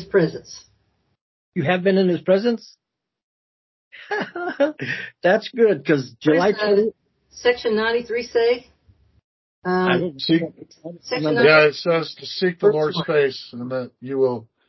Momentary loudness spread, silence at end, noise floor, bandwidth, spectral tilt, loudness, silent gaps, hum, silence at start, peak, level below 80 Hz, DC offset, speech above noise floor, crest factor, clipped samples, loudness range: 11 LU; 0.25 s; -66 dBFS; 6.2 kHz; -6.5 dB/octave; -20 LUFS; 1.21-1.52 s, 3.24-3.91 s, 9.24-9.62 s; none; 0 s; 0 dBFS; -62 dBFS; under 0.1%; 47 dB; 20 dB; under 0.1%; 4 LU